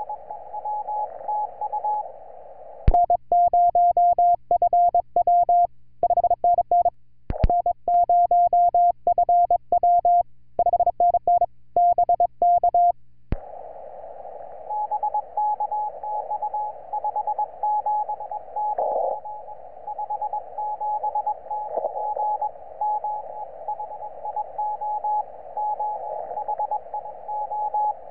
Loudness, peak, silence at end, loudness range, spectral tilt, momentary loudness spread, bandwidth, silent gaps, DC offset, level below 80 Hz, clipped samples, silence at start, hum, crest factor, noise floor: -23 LUFS; -6 dBFS; 0 s; 9 LU; -8 dB/octave; 16 LU; 2.8 kHz; none; 0.6%; -40 dBFS; under 0.1%; 0 s; 60 Hz at -60 dBFS; 18 dB; -43 dBFS